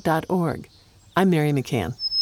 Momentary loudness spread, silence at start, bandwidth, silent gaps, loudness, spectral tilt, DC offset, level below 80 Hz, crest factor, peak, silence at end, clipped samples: 8 LU; 0.05 s; 17 kHz; none; -23 LUFS; -6 dB/octave; under 0.1%; -52 dBFS; 18 dB; -6 dBFS; 0 s; under 0.1%